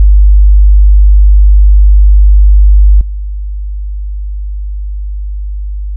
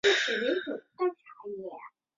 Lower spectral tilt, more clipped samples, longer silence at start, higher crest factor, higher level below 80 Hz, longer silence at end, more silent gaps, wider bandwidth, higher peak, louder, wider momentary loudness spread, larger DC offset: first, -15 dB/octave vs -2 dB/octave; neither; about the same, 0 s vs 0.05 s; second, 6 dB vs 20 dB; first, -6 dBFS vs -76 dBFS; second, 0 s vs 0.3 s; neither; second, 0.2 kHz vs 7.6 kHz; first, 0 dBFS vs -12 dBFS; first, -8 LUFS vs -31 LUFS; second, 14 LU vs 18 LU; neither